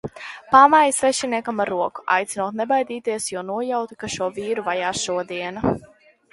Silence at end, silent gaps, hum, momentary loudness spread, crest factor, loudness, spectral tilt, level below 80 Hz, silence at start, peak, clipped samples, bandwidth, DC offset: 0.5 s; none; none; 13 LU; 22 dB; -21 LUFS; -3.5 dB/octave; -54 dBFS; 0.05 s; 0 dBFS; under 0.1%; 11.5 kHz; under 0.1%